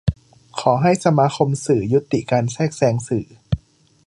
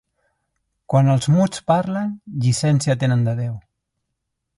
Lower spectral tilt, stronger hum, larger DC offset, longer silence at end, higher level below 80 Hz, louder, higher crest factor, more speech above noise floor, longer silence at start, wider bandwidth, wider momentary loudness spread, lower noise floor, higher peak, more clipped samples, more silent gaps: about the same, -6.5 dB/octave vs -6.5 dB/octave; neither; neither; second, 0.5 s vs 1 s; first, -40 dBFS vs -54 dBFS; about the same, -19 LUFS vs -19 LUFS; about the same, 18 dB vs 16 dB; second, 33 dB vs 59 dB; second, 0.05 s vs 0.9 s; about the same, 11.5 kHz vs 11.5 kHz; about the same, 10 LU vs 9 LU; second, -51 dBFS vs -78 dBFS; about the same, -2 dBFS vs -4 dBFS; neither; neither